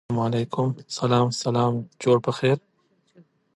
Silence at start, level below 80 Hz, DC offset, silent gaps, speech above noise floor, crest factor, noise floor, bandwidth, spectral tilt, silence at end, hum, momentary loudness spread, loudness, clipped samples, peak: 0.1 s; -60 dBFS; under 0.1%; none; 38 dB; 18 dB; -61 dBFS; 11.5 kHz; -6 dB/octave; 1 s; none; 6 LU; -24 LUFS; under 0.1%; -8 dBFS